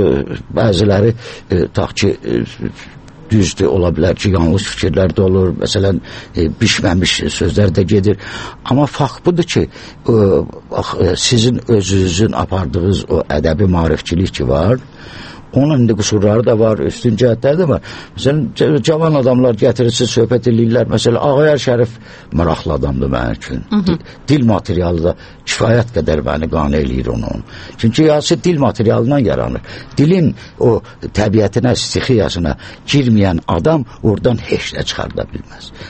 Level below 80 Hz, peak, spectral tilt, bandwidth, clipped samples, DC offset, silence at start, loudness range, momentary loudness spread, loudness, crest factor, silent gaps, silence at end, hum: -32 dBFS; 0 dBFS; -6 dB/octave; 8.8 kHz; under 0.1%; under 0.1%; 0 s; 3 LU; 9 LU; -14 LUFS; 14 dB; none; 0 s; none